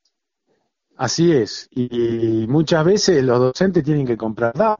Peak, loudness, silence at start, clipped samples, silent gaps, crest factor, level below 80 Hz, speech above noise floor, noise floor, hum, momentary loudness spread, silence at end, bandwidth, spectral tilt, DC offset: -2 dBFS; -18 LUFS; 1 s; under 0.1%; none; 16 dB; -50 dBFS; 54 dB; -71 dBFS; none; 8 LU; 0.05 s; 7.4 kHz; -6 dB/octave; under 0.1%